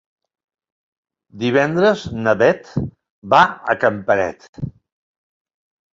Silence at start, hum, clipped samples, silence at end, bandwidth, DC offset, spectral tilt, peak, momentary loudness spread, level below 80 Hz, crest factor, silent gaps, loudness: 1.35 s; none; under 0.1%; 1.2 s; 7.8 kHz; under 0.1%; -6 dB/octave; -2 dBFS; 17 LU; -50 dBFS; 18 dB; 3.10-3.22 s, 4.49-4.53 s; -17 LUFS